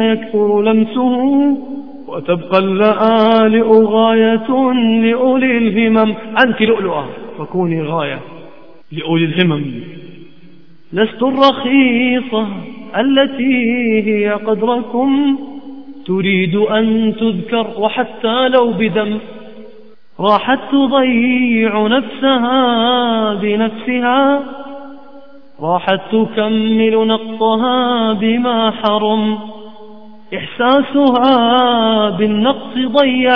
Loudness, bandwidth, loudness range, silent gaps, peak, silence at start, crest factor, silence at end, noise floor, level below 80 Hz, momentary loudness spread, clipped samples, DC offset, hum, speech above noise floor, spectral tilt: -13 LUFS; 5.4 kHz; 5 LU; none; 0 dBFS; 0 s; 14 dB; 0 s; -44 dBFS; -60 dBFS; 13 LU; under 0.1%; 1%; none; 31 dB; -8.5 dB/octave